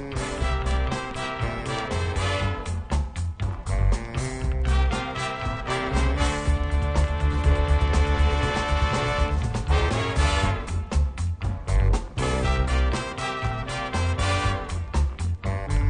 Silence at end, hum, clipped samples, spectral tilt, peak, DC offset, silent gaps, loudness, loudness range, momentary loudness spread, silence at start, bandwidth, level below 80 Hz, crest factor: 0 s; none; under 0.1%; -5.5 dB/octave; -10 dBFS; under 0.1%; none; -26 LUFS; 4 LU; 6 LU; 0 s; 10 kHz; -26 dBFS; 14 dB